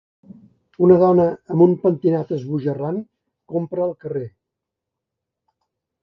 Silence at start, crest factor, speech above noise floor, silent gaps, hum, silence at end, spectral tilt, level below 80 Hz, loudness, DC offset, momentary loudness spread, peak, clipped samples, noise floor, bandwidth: 0.8 s; 18 dB; 65 dB; none; none; 1.75 s; -11.5 dB/octave; -60 dBFS; -19 LUFS; under 0.1%; 15 LU; -2 dBFS; under 0.1%; -83 dBFS; 5.4 kHz